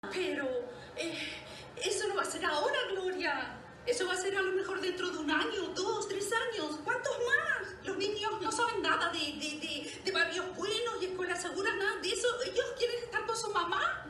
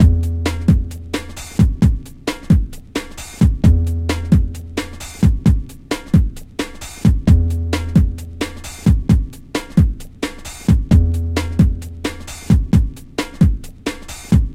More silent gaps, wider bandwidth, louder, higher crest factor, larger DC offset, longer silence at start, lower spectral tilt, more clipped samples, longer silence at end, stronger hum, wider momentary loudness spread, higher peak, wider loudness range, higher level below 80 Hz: neither; second, 12.5 kHz vs 15.5 kHz; second, -33 LUFS vs -18 LUFS; about the same, 18 dB vs 16 dB; neither; about the same, 0.05 s vs 0 s; second, -2 dB/octave vs -7 dB/octave; neither; about the same, 0 s vs 0 s; neither; second, 7 LU vs 12 LU; second, -16 dBFS vs 0 dBFS; about the same, 2 LU vs 2 LU; second, -64 dBFS vs -20 dBFS